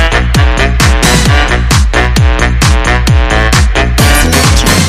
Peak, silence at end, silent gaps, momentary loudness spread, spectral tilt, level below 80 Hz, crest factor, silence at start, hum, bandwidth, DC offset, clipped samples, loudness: 0 dBFS; 0 s; none; 3 LU; -4 dB/octave; -10 dBFS; 6 dB; 0 s; none; 16 kHz; under 0.1%; 0.5%; -8 LUFS